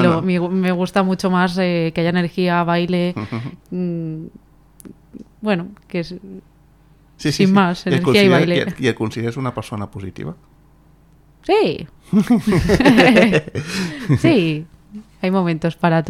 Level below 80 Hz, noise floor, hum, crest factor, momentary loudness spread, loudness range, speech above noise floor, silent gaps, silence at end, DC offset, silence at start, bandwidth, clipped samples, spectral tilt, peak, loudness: -42 dBFS; -50 dBFS; none; 18 dB; 16 LU; 11 LU; 33 dB; none; 0 s; under 0.1%; 0 s; 14 kHz; under 0.1%; -6.5 dB/octave; 0 dBFS; -17 LUFS